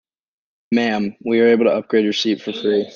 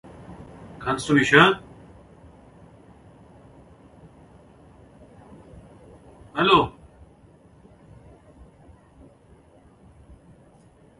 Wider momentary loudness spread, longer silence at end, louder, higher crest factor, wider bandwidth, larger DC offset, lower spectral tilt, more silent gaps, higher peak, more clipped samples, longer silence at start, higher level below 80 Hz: second, 7 LU vs 28 LU; second, 0.05 s vs 4.3 s; about the same, -18 LUFS vs -20 LUFS; second, 16 dB vs 26 dB; second, 7.4 kHz vs 11.5 kHz; neither; about the same, -5 dB/octave vs -5 dB/octave; neither; second, -4 dBFS vs 0 dBFS; neither; first, 0.7 s vs 0.3 s; second, -66 dBFS vs -54 dBFS